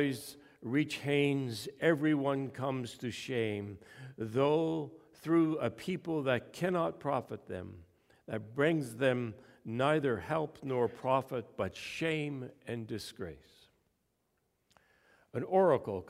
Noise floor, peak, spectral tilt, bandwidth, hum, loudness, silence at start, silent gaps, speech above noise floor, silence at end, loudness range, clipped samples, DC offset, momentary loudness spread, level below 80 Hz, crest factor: -79 dBFS; -14 dBFS; -6.5 dB/octave; 15.5 kHz; none; -34 LUFS; 0 s; none; 46 dB; 0.05 s; 7 LU; under 0.1%; under 0.1%; 14 LU; -70 dBFS; 20 dB